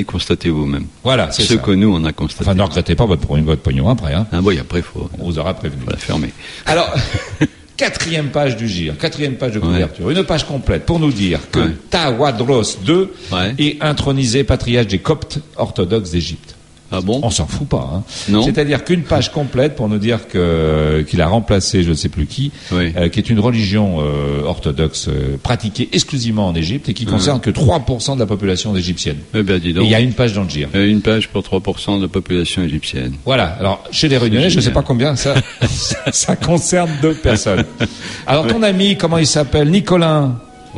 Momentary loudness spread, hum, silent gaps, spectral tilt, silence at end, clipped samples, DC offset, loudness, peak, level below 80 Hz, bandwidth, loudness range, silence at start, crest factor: 7 LU; none; none; -5 dB/octave; 0 s; under 0.1%; under 0.1%; -16 LUFS; 0 dBFS; -30 dBFS; 11.5 kHz; 4 LU; 0 s; 14 dB